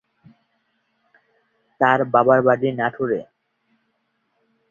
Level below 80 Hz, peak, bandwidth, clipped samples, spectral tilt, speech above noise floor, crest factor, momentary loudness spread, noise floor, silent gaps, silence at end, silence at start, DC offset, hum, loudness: -66 dBFS; -2 dBFS; 7 kHz; under 0.1%; -8.5 dB/octave; 53 dB; 20 dB; 9 LU; -70 dBFS; none; 1.5 s; 1.8 s; under 0.1%; none; -19 LUFS